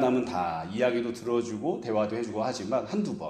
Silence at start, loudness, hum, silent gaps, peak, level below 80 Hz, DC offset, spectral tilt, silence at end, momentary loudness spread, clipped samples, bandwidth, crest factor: 0 s; -29 LUFS; none; none; -12 dBFS; -64 dBFS; under 0.1%; -6 dB/octave; 0 s; 4 LU; under 0.1%; 12.5 kHz; 16 dB